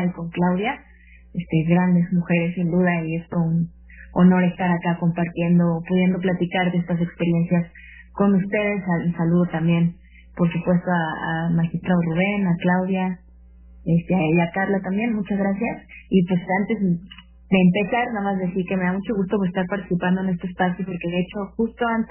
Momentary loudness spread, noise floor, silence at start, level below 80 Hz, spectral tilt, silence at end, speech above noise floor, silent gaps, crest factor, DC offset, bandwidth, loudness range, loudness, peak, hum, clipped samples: 7 LU; -47 dBFS; 0 s; -48 dBFS; -11.5 dB/octave; 0.05 s; 26 dB; none; 16 dB; under 0.1%; 3.2 kHz; 2 LU; -22 LUFS; -4 dBFS; none; under 0.1%